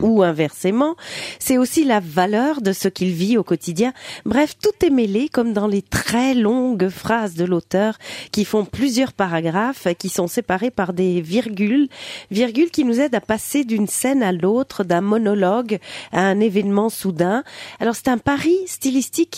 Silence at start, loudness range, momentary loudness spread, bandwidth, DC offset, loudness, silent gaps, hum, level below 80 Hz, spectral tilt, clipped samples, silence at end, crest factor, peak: 0 s; 2 LU; 5 LU; 16 kHz; under 0.1%; -19 LUFS; none; none; -50 dBFS; -5 dB/octave; under 0.1%; 0 s; 16 dB; -2 dBFS